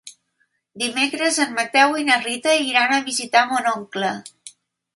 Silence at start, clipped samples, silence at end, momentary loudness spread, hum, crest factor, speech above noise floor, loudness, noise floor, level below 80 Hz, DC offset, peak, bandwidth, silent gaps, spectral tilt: 0.05 s; under 0.1%; 0.45 s; 9 LU; none; 20 dB; 49 dB; -19 LUFS; -69 dBFS; -74 dBFS; under 0.1%; 0 dBFS; 12 kHz; none; -1.5 dB/octave